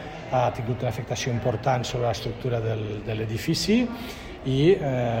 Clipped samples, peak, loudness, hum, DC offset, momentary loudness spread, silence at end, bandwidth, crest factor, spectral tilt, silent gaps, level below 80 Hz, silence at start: under 0.1%; -6 dBFS; -26 LUFS; none; under 0.1%; 9 LU; 0 s; 16 kHz; 18 dB; -6 dB/octave; none; -46 dBFS; 0 s